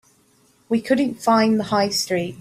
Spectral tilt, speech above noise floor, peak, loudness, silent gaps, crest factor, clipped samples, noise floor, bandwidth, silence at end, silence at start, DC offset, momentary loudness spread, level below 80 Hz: -4.5 dB/octave; 39 dB; -4 dBFS; -20 LUFS; none; 16 dB; under 0.1%; -58 dBFS; 15.5 kHz; 0 s; 0.7 s; under 0.1%; 7 LU; -62 dBFS